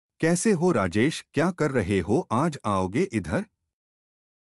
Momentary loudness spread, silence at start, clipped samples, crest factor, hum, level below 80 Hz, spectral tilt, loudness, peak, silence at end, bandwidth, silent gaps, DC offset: 6 LU; 0.2 s; under 0.1%; 16 dB; none; -52 dBFS; -6 dB/octave; -25 LUFS; -10 dBFS; 1 s; 13 kHz; none; under 0.1%